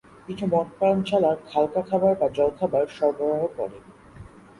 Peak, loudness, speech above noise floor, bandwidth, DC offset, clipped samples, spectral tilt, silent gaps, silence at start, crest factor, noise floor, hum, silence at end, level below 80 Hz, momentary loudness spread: -8 dBFS; -24 LUFS; 23 dB; 11.5 kHz; under 0.1%; under 0.1%; -7.5 dB/octave; none; 0.3 s; 16 dB; -46 dBFS; none; 0.35 s; -58 dBFS; 8 LU